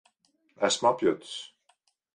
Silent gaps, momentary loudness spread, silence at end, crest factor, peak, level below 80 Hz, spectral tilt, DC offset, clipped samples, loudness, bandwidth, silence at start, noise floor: none; 16 LU; 0.7 s; 20 dB; -10 dBFS; -74 dBFS; -3 dB/octave; under 0.1%; under 0.1%; -27 LUFS; 11.5 kHz; 0.6 s; -70 dBFS